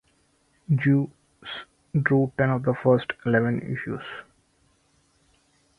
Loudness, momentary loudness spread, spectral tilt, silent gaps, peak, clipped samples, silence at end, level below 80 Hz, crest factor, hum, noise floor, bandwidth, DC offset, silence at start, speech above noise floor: -24 LUFS; 16 LU; -9 dB/octave; none; -6 dBFS; under 0.1%; 1.55 s; -60 dBFS; 20 dB; none; -65 dBFS; 4.4 kHz; under 0.1%; 0.7 s; 43 dB